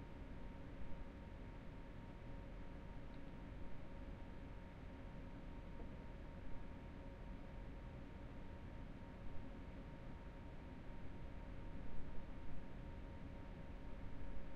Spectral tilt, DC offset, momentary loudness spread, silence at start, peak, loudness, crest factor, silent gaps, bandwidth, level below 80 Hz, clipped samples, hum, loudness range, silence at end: -8 dB/octave; under 0.1%; 1 LU; 0 s; -32 dBFS; -56 LUFS; 16 dB; none; 6.6 kHz; -54 dBFS; under 0.1%; none; 1 LU; 0 s